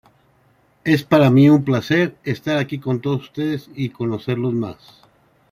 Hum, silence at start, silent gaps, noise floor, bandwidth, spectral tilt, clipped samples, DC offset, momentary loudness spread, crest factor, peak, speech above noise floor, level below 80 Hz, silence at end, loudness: none; 0.85 s; none; -58 dBFS; 15 kHz; -7.5 dB/octave; under 0.1%; under 0.1%; 13 LU; 18 dB; -2 dBFS; 40 dB; -56 dBFS; 0.8 s; -19 LUFS